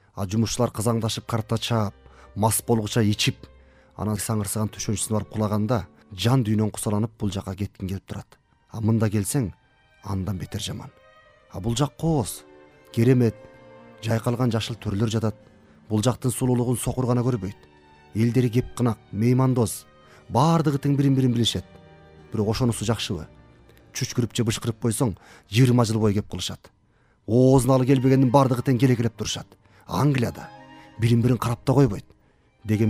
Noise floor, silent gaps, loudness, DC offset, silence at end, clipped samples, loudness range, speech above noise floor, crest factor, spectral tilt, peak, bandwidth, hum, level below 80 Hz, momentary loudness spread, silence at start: -62 dBFS; none; -24 LUFS; under 0.1%; 0 s; under 0.1%; 7 LU; 39 dB; 20 dB; -6 dB/octave; -4 dBFS; 15.5 kHz; none; -50 dBFS; 13 LU; 0.15 s